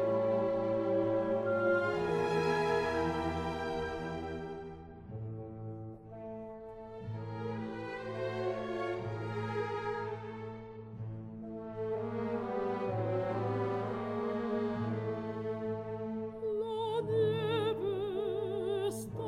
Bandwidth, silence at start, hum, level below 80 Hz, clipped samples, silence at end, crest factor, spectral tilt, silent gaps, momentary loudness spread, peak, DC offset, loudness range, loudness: 14.5 kHz; 0 s; none; -60 dBFS; under 0.1%; 0 s; 16 dB; -7 dB/octave; none; 14 LU; -20 dBFS; under 0.1%; 10 LU; -35 LUFS